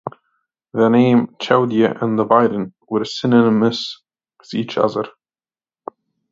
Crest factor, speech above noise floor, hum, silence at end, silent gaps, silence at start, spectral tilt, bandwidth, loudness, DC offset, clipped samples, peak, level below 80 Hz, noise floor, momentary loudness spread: 18 dB; over 74 dB; none; 1.2 s; none; 0.05 s; -7 dB/octave; 7.6 kHz; -17 LUFS; under 0.1%; under 0.1%; 0 dBFS; -64 dBFS; under -90 dBFS; 20 LU